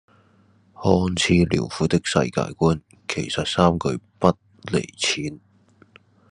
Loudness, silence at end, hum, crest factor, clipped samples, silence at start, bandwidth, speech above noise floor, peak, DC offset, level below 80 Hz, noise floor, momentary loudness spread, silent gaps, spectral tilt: -22 LUFS; 0.95 s; none; 22 dB; under 0.1%; 0.8 s; 11 kHz; 36 dB; 0 dBFS; under 0.1%; -50 dBFS; -57 dBFS; 9 LU; none; -5 dB/octave